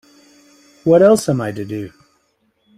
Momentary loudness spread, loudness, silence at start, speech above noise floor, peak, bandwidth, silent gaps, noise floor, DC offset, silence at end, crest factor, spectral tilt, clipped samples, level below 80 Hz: 17 LU; -15 LUFS; 0.85 s; 49 dB; -2 dBFS; 15.5 kHz; none; -63 dBFS; under 0.1%; 0.9 s; 16 dB; -6.5 dB/octave; under 0.1%; -56 dBFS